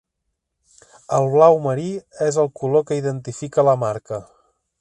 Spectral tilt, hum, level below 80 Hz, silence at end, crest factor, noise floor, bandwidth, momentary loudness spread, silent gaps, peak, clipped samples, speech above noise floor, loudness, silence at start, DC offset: -7 dB/octave; none; -62 dBFS; 0.55 s; 20 dB; -77 dBFS; 11 kHz; 15 LU; none; 0 dBFS; under 0.1%; 58 dB; -19 LUFS; 1.1 s; under 0.1%